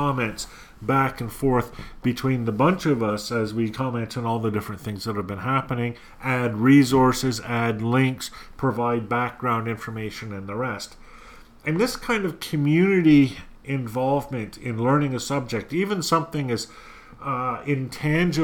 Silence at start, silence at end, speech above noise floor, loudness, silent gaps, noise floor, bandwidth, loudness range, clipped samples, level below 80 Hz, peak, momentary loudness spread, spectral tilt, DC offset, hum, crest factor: 0 s; 0 s; 23 dB; -24 LUFS; none; -46 dBFS; 19 kHz; 6 LU; under 0.1%; -48 dBFS; -6 dBFS; 13 LU; -6 dB/octave; under 0.1%; none; 18 dB